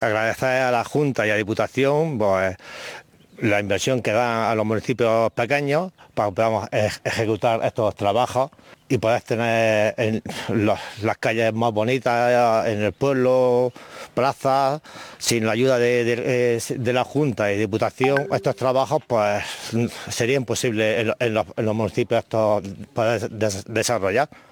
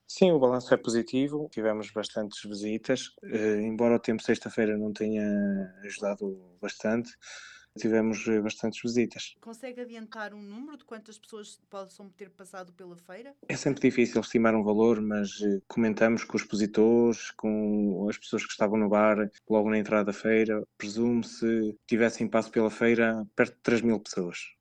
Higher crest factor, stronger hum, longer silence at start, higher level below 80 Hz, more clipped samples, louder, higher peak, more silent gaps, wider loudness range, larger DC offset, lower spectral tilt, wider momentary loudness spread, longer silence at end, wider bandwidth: second, 16 dB vs 22 dB; neither; about the same, 0 s vs 0.1 s; first, -58 dBFS vs -64 dBFS; neither; first, -21 LUFS vs -28 LUFS; about the same, -6 dBFS vs -6 dBFS; neither; second, 2 LU vs 10 LU; neither; about the same, -5 dB/octave vs -5.5 dB/octave; second, 7 LU vs 20 LU; first, 0.25 s vs 0.1 s; first, 19.5 kHz vs 9.6 kHz